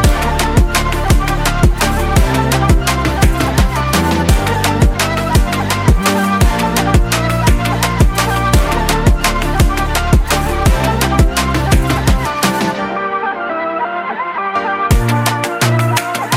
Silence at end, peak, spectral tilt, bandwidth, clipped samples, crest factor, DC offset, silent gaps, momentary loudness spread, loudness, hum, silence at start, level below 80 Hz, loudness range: 0 s; 0 dBFS; -5 dB/octave; 16.5 kHz; under 0.1%; 12 dB; under 0.1%; none; 4 LU; -14 LUFS; none; 0 s; -18 dBFS; 3 LU